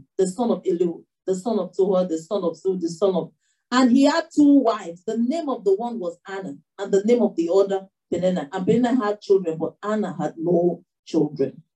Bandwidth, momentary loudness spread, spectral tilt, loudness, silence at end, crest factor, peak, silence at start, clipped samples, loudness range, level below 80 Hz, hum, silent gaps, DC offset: 11 kHz; 11 LU; -6.5 dB/octave; -22 LUFS; 0.15 s; 16 dB; -6 dBFS; 0.2 s; under 0.1%; 3 LU; -72 dBFS; none; 10.99-11.03 s; under 0.1%